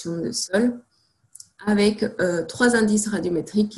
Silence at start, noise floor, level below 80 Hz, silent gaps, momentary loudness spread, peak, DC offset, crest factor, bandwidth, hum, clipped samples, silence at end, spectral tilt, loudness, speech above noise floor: 0 s; -54 dBFS; -56 dBFS; none; 7 LU; -4 dBFS; under 0.1%; 18 dB; 12.5 kHz; none; under 0.1%; 0 s; -4.5 dB/octave; -22 LUFS; 32 dB